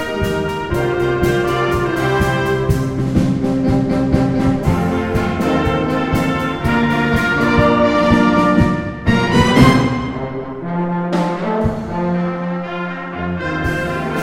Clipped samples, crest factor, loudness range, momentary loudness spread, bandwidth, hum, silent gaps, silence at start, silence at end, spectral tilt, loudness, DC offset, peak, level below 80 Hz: under 0.1%; 16 dB; 6 LU; 9 LU; 16.5 kHz; none; none; 0 s; 0 s; -7 dB/octave; -16 LUFS; under 0.1%; 0 dBFS; -32 dBFS